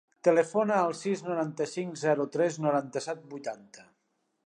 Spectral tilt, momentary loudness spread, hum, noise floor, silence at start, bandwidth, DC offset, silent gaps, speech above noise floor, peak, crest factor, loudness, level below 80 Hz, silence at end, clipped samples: -5.5 dB/octave; 13 LU; none; -77 dBFS; 0.25 s; 10.5 kHz; under 0.1%; none; 48 dB; -10 dBFS; 20 dB; -29 LUFS; -84 dBFS; 0.65 s; under 0.1%